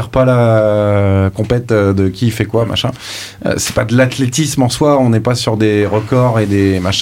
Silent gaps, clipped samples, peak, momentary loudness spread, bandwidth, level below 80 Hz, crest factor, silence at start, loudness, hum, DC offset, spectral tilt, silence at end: none; under 0.1%; 0 dBFS; 6 LU; 16.5 kHz; -40 dBFS; 12 dB; 0 s; -13 LUFS; none; under 0.1%; -5.5 dB/octave; 0 s